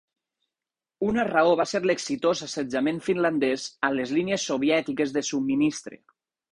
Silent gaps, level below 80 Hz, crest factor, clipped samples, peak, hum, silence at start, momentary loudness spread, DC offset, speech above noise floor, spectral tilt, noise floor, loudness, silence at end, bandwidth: none; -62 dBFS; 18 dB; under 0.1%; -8 dBFS; none; 1 s; 5 LU; under 0.1%; over 65 dB; -4.5 dB/octave; under -90 dBFS; -25 LUFS; 0.6 s; 11 kHz